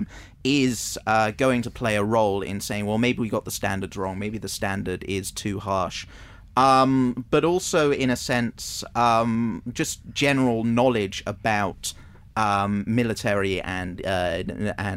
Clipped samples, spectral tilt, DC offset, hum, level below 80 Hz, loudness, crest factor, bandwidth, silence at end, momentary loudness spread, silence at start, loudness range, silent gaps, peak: under 0.1%; -5 dB/octave; under 0.1%; none; -48 dBFS; -24 LUFS; 18 dB; 16 kHz; 0 s; 9 LU; 0 s; 5 LU; none; -6 dBFS